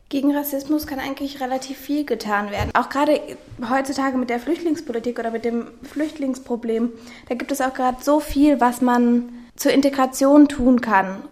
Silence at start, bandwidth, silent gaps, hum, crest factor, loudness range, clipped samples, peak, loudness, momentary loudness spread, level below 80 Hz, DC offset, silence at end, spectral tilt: 0.1 s; 16 kHz; none; none; 18 dB; 7 LU; under 0.1%; -2 dBFS; -20 LUFS; 11 LU; -46 dBFS; under 0.1%; 0.05 s; -5 dB/octave